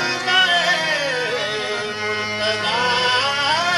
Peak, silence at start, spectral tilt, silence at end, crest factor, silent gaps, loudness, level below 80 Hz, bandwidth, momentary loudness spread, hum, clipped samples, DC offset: -4 dBFS; 0 s; -1.5 dB/octave; 0 s; 16 dB; none; -18 LUFS; -58 dBFS; 12 kHz; 8 LU; none; under 0.1%; under 0.1%